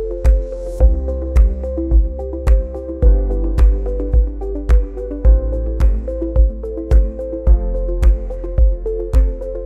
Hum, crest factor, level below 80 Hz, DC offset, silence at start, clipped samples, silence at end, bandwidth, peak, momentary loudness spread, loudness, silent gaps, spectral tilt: none; 14 dB; -14 dBFS; 0.2%; 0 s; under 0.1%; 0 s; 2.8 kHz; -2 dBFS; 6 LU; -18 LUFS; none; -9.5 dB/octave